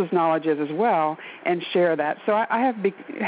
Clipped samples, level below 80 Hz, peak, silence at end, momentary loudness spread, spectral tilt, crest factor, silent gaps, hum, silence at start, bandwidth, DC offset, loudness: under 0.1%; -76 dBFS; -10 dBFS; 0 s; 6 LU; -4 dB/octave; 12 dB; none; none; 0 s; 5 kHz; under 0.1%; -23 LUFS